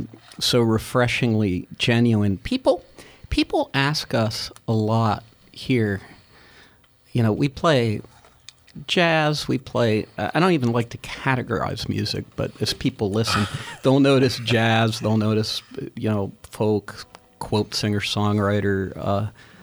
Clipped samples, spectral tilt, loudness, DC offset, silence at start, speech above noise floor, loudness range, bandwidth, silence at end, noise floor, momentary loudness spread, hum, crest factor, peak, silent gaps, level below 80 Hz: under 0.1%; -5.5 dB/octave; -22 LUFS; under 0.1%; 0 s; 33 dB; 4 LU; over 20 kHz; 0.3 s; -55 dBFS; 9 LU; none; 18 dB; -4 dBFS; none; -46 dBFS